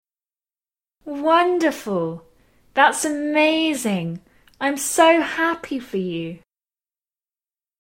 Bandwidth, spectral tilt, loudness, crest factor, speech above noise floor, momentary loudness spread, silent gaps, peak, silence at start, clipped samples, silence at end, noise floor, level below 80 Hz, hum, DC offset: 16.5 kHz; -3.5 dB/octave; -20 LUFS; 20 dB; over 70 dB; 14 LU; none; -2 dBFS; 1.05 s; under 0.1%; 1.45 s; under -90 dBFS; -62 dBFS; none; under 0.1%